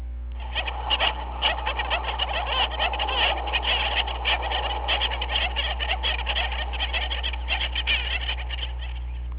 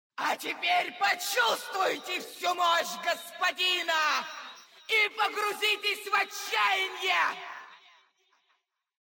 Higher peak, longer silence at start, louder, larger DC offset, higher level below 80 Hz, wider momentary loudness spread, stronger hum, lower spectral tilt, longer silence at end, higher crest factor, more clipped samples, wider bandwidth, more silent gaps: first, -10 dBFS vs -14 dBFS; second, 0 s vs 0.2 s; first, -25 LUFS vs -28 LUFS; neither; first, -32 dBFS vs under -90 dBFS; about the same, 7 LU vs 8 LU; first, 60 Hz at -30 dBFS vs none; about the same, -0.5 dB/octave vs 0.5 dB/octave; second, 0 s vs 1.3 s; about the same, 16 dB vs 16 dB; neither; second, 4 kHz vs 17 kHz; neither